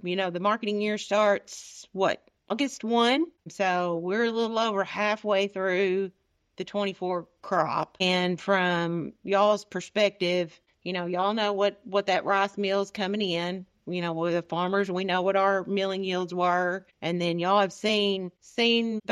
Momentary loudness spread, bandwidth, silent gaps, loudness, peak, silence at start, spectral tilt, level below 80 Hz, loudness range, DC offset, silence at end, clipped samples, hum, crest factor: 9 LU; 12 kHz; none; -27 LUFS; -10 dBFS; 0.05 s; -5 dB/octave; -74 dBFS; 2 LU; under 0.1%; 0 s; under 0.1%; none; 18 dB